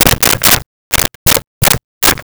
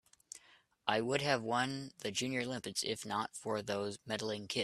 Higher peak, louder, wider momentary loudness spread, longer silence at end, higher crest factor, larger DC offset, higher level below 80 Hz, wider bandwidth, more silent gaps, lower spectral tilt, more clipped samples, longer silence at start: first, 0 dBFS vs -14 dBFS; first, -10 LUFS vs -37 LUFS; second, 5 LU vs 8 LU; about the same, 0 s vs 0 s; second, 12 dB vs 24 dB; first, 0.9% vs under 0.1%; first, -28 dBFS vs -76 dBFS; first, over 20 kHz vs 14 kHz; first, 0.66-0.91 s, 1.15-1.26 s, 1.47-1.61 s, 1.84-2.01 s vs none; second, -2 dB/octave vs -3.5 dB/octave; neither; second, 0 s vs 0.35 s